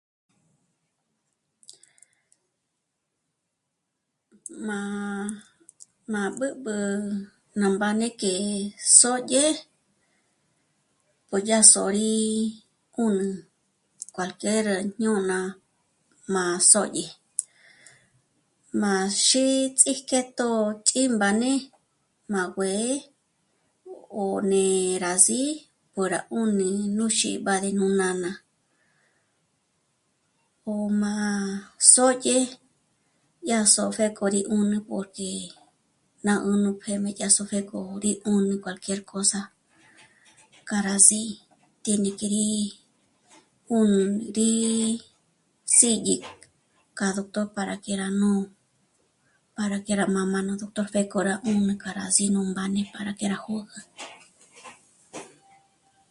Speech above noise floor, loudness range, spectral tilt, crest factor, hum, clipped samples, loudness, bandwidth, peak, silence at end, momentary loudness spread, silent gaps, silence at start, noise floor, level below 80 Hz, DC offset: 56 dB; 9 LU; -3 dB/octave; 26 dB; none; under 0.1%; -23 LUFS; 11.5 kHz; 0 dBFS; 0.85 s; 17 LU; none; 4.5 s; -80 dBFS; -68 dBFS; under 0.1%